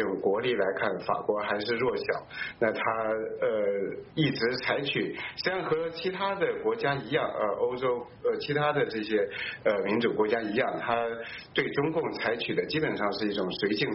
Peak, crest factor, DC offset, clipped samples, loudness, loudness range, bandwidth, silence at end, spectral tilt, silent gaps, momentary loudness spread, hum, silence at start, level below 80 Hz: -12 dBFS; 16 dB; under 0.1%; under 0.1%; -29 LUFS; 1 LU; 6 kHz; 0 s; -3 dB/octave; none; 4 LU; none; 0 s; -64 dBFS